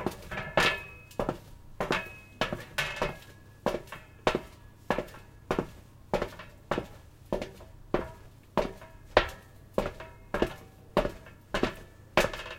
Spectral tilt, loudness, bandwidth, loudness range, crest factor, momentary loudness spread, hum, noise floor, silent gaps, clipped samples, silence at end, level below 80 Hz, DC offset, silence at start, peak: -4.5 dB/octave; -33 LUFS; 16.5 kHz; 4 LU; 28 dB; 21 LU; none; -51 dBFS; none; under 0.1%; 0 s; -46 dBFS; under 0.1%; 0 s; -4 dBFS